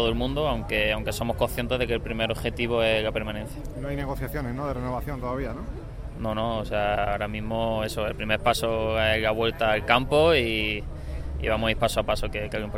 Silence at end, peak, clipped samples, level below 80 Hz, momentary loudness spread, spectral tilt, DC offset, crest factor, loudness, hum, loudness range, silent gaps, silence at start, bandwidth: 0 s; -4 dBFS; under 0.1%; -36 dBFS; 11 LU; -5 dB/octave; under 0.1%; 22 dB; -26 LUFS; none; 7 LU; none; 0 s; 16 kHz